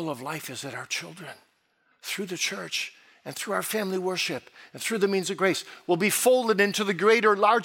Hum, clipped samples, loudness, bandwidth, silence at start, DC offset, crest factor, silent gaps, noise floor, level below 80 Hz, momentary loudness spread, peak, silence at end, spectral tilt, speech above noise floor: none; under 0.1%; -26 LUFS; 17 kHz; 0 s; under 0.1%; 20 dB; none; -69 dBFS; -82 dBFS; 17 LU; -6 dBFS; 0 s; -3 dB/octave; 42 dB